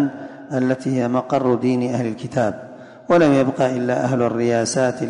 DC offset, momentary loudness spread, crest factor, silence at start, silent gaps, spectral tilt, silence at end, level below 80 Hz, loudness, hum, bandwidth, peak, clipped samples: under 0.1%; 9 LU; 14 dB; 0 s; none; -6 dB/octave; 0 s; -58 dBFS; -19 LUFS; none; 10.5 kHz; -6 dBFS; under 0.1%